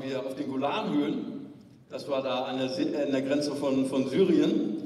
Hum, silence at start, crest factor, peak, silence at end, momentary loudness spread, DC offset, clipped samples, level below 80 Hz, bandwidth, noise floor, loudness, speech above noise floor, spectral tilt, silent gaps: none; 0 s; 16 dB; -12 dBFS; 0 s; 14 LU; under 0.1%; under 0.1%; -74 dBFS; 12 kHz; -48 dBFS; -28 LUFS; 20 dB; -6 dB/octave; none